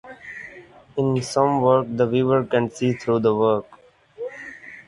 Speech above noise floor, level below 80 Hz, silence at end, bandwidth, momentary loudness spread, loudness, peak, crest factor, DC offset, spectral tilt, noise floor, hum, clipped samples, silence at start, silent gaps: 25 dB; -58 dBFS; 0.05 s; 11.5 kHz; 18 LU; -21 LUFS; -4 dBFS; 18 dB; under 0.1%; -6.5 dB/octave; -45 dBFS; none; under 0.1%; 0.05 s; none